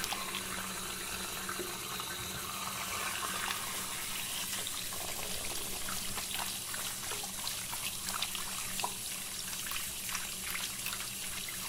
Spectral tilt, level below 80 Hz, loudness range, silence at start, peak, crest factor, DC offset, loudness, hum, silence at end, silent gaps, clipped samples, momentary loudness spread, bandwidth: -0.5 dB/octave; -56 dBFS; 1 LU; 0 s; -12 dBFS; 26 dB; under 0.1%; -36 LUFS; none; 0 s; none; under 0.1%; 3 LU; 17 kHz